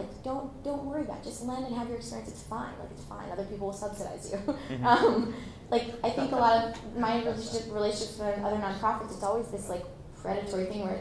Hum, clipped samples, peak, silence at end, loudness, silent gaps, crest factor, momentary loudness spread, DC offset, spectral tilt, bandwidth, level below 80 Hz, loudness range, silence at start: none; under 0.1%; -8 dBFS; 0 s; -31 LUFS; none; 24 dB; 14 LU; under 0.1%; -5 dB/octave; 11 kHz; -52 dBFS; 9 LU; 0 s